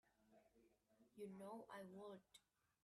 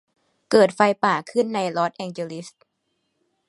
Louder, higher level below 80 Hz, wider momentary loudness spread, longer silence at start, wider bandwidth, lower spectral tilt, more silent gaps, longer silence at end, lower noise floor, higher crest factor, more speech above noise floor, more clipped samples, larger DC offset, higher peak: second, -59 LUFS vs -21 LUFS; second, under -90 dBFS vs -72 dBFS; second, 4 LU vs 14 LU; second, 0.05 s vs 0.5 s; about the same, 12.5 kHz vs 11.5 kHz; about the same, -5.5 dB/octave vs -5 dB/octave; neither; second, 0.45 s vs 1 s; first, -79 dBFS vs -74 dBFS; about the same, 16 dB vs 20 dB; second, 21 dB vs 53 dB; neither; neither; second, -44 dBFS vs -2 dBFS